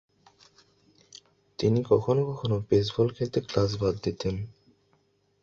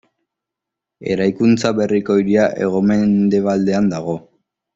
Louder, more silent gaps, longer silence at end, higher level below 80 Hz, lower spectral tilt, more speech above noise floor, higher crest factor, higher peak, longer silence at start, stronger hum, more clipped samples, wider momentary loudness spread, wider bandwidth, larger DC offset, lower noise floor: second, -27 LUFS vs -16 LUFS; neither; first, 0.9 s vs 0.55 s; about the same, -52 dBFS vs -54 dBFS; about the same, -7.5 dB/octave vs -7 dB/octave; second, 42 dB vs 68 dB; first, 20 dB vs 14 dB; second, -10 dBFS vs -2 dBFS; first, 1.6 s vs 1 s; first, 50 Hz at -50 dBFS vs none; neither; about the same, 9 LU vs 9 LU; about the same, 7.6 kHz vs 7.8 kHz; neither; second, -68 dBFS vs -83 dBFS